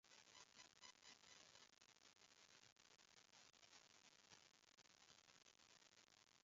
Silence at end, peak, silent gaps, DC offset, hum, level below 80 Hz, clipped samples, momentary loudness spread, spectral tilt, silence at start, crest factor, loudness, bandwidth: 0 s; -48 dBFS; 2.72-2.76 s; under 0.1%; none; under -90 dBFS; under 0.1%; 5 LU; 0.5 dB/octave; 0.05 s; 24 dB; -68 LUFS; 7.6 kHz